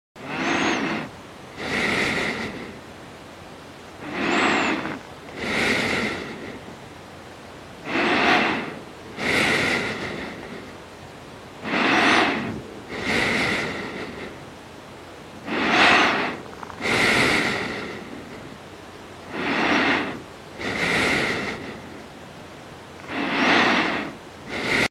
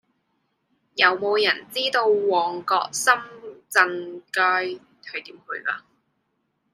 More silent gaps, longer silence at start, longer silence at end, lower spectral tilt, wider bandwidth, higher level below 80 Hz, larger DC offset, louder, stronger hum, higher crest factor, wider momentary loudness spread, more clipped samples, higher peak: neither; second, 0.15 s vs 0.95 s; second, 0 s vs 0.95 s; first, -3.5 dB/octave vs -1.5 dB/octave; first, 16 kHz vs 14.5 kHz; first, -52 dBFS vs -78 dBFS; neither; about the same, -22 LUFS vs -21 LUFS; neither; about the same, 22 dB vs 22 dB; first, 23 LU vs 15 LU; neither; about the same, -4 dBFS vs -2 dBFS